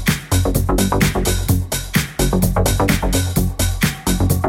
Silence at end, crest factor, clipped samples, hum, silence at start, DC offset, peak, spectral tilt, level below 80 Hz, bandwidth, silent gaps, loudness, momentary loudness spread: 0 s; 14 dB; under 0.1%; none; 0 s; under 0.1%; -2 dBFS; -4.5 dB/octave; -24 dBFS; 17 kHz; none; -18 LUFS; 3 LU